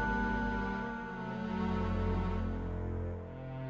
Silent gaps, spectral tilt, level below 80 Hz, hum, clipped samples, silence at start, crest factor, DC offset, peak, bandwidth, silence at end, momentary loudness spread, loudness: none; -8 dB/octave; -42 dBFS; none; under 0.1%; 0 s; 14 dB; under 0.1%; -22 dBFS; 7.8 kHz; 0 s; 7 LU; -37 LUFS